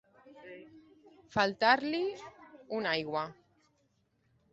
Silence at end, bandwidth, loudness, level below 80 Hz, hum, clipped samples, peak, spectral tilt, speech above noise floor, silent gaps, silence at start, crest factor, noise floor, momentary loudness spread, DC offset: 1.2 s; 8 kHz; -31 LUFS; -72 dBFS; none; under 0.1%; -12 dBFS; -1.5 dB/octave; 43 dB; none; 0.25 s; 24 dB; -74 dBFS; 24 LU; under 0.1%